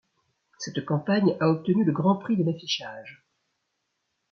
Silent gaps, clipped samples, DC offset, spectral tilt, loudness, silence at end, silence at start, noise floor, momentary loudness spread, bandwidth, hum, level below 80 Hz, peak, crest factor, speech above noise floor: none; under 0.1%; under 0.1%; -6.5 dB/octave; -25 LUFS; 1.15 s; 0.6 s; -78 dBFS; 13 LU; 6.8 kHz; none; -70 dBFS; -10 dBFS; 18 dB; 53 dB